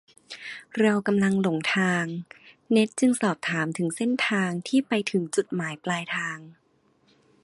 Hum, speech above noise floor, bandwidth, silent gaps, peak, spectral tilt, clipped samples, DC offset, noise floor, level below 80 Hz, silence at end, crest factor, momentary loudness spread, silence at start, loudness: none; 40 dB; 11.5 kHz; none; -8 dBFS; -5 dB/octave; under 0.1%; under 0.1%; -65 dBFS; -70 dBFS; 0.9 s; 18 dB; 14 LU; 0.3 s; -25 LUFS